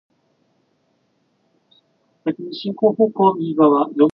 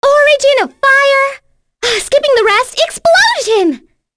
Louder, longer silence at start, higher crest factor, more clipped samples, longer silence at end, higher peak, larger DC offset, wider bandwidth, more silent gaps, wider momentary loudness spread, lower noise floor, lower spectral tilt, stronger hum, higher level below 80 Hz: second, -18 LUFS vs -10 LUFS; first, 2.25 s vs 0 s; first, 18 dB vs 10 dB; neither; second, 0.05 s vs 0.4 s; about the same, -2 dBFS vs 0 dBFS; neither; second, 5.6 kHz vs 11 kHz; neither; first, 12 LU vs 8 LU; first, -65 dBFS vs -38 dBFS; first, -10 dB/octave vs -1 dB/octave; neither; second, -70 dBFS vs -48 dBFS